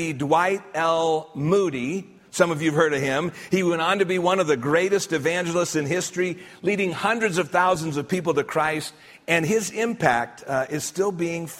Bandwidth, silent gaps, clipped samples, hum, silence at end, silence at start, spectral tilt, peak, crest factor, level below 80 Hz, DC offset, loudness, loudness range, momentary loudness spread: 16 kHz; none; under 0.1%; none; 0 s; 0 s; -4.5 dB/octave; -4 dBFS; 20 dB; -62 dBFS; under 0.1%; -23 LUFS; 2 LU; 6 LU